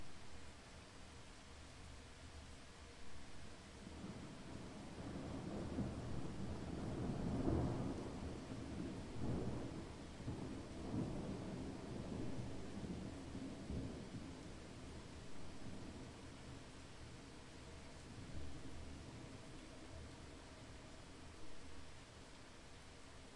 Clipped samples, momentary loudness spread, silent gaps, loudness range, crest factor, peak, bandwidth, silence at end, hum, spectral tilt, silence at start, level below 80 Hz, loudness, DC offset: under 0.1%; 13 LU; none; 12 LU; 24 dB; -24 dBFS; 11.5 kHz; 0 s; none; -6 dB/octave; 0 s; -58 dBFS; -51 LUFS; under 0.1%